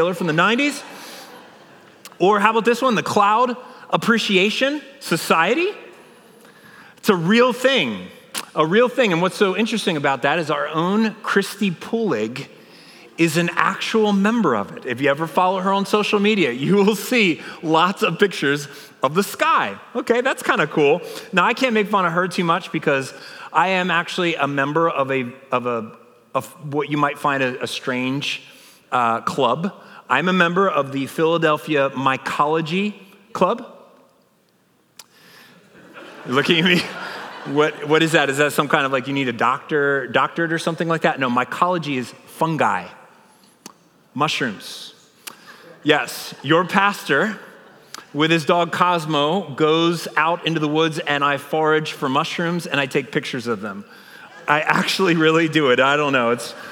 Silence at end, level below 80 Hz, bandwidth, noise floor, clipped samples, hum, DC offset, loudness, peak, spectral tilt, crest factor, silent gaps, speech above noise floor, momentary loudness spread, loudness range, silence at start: 0 s; -76 dBFS; 19.5 kHz; -60 dBFS; under 0.1%; none; under 0.1%; -19 LUFS; 0 dBFS; -5 dB/octave; 20 dB; none; 41 dB; 11 LU; 5 LU; 0 s